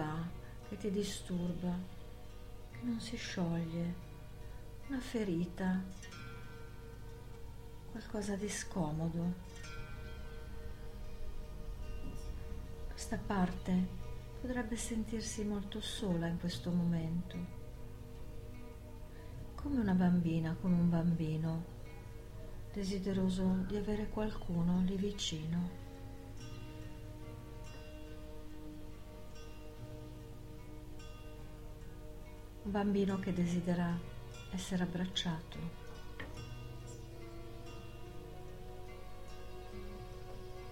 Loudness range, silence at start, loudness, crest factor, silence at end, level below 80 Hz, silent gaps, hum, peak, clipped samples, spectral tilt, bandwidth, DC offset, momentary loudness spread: 15 LU; 0 s; -39 LUFS; 18 dB; 0 s; -50 dBFS; none; 50 Hz at -55 dBFS; -22 dBFS; under 0.1%; -6 dB/octave; 16 kHz; under 0.1%; 17 LU